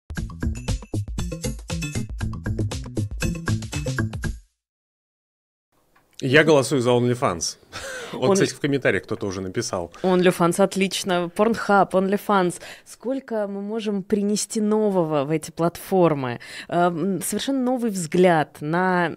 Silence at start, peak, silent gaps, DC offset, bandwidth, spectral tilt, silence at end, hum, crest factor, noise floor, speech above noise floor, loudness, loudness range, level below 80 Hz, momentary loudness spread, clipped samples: 0.1 s; -2 dBFS; 4.69-5.72 s; under 0.1%; 16 kHz; -5 dB/octave; 0 s; none; 20 dB; -48 dBFS; 26 dB; -23 LUFS; 8 LU; -40 dBFS; 11 LU; under 0.1%